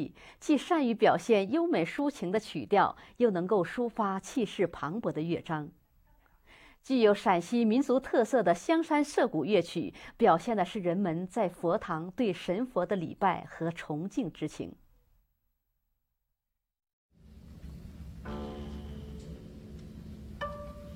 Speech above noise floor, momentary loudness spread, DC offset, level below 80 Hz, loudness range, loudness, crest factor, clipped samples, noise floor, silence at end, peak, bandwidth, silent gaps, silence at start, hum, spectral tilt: 56 dB; 19 LU; under 0.1%; -56 dBFS; 17 LU; -30 LUFS; 20 dB; under 0.1%; -85 dBFS; 0 s; -12 dBFS; 16 kHz; 16.93-17.09 s; 0 s; none; -6 dB/octave